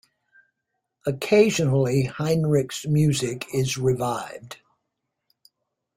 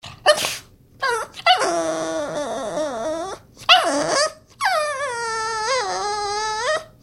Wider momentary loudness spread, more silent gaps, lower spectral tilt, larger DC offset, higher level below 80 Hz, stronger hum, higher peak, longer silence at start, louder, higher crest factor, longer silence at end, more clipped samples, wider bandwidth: first, 14 LU vs 11 LU; neither; first, -6 dB/octave vs -1 dB/octave; neither; about the same, -56 dBFS vs -56 dBFS; neither; second, -4 dBFS vs 0 dBFS; first, 1.05 s vs 0.05 s; about the same, -23 LUFS vs -21 LUFS; about the same, 20 dB vs 22 dB; first, 1.4 s vs 0.15 s; neither; about the same, 16 kHz vs 16.5 kHz